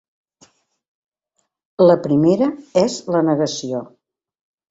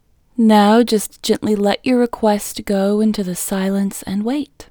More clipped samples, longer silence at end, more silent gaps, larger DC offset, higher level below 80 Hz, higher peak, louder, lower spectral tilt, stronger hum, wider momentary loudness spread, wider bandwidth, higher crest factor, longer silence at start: neither; first, 0.85 s vs 0.05 s; neither; neither; second, -60 dBFS vs -48 dBFS; about the same, -2 dBFS vs 0 dBFS; about the same, -17 LUFS vs -17 LUFS; first, -6.5 dB/octave vs -5 dB/octave; neither; first, 12 LU vs 9 LU; second, 7.8 kHz vs over 20 kHz; about the same, 18 dB vs 16 dB; first, 1.8 s vs 0.4 s